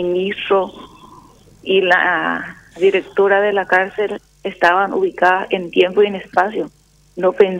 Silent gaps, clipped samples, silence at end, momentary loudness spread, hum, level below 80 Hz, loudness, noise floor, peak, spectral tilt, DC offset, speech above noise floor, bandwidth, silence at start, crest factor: none; under 0.1%; 0 s; 13 LU; 50 Hz at -55 dBFS; -56 dBFS; -16 LUFS; -45 dBFS; 0 dBFS; -5.5 dB/octave; under 0.1%; 29 dB; 9 kHz; 0 s; 16 dB